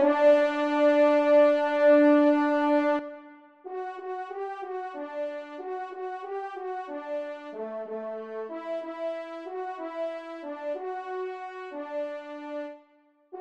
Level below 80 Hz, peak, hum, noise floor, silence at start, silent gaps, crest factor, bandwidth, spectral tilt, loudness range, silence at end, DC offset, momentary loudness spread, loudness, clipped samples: -82 dBFS; -10 dBFS; none; -63 dBFS; 0 s; none; 16 dB; 7.4 kHz; -4.5 dB/octave; 13 LU; 0 s; under 0.1%; 18 LU; -27 LUFS; under 0.1%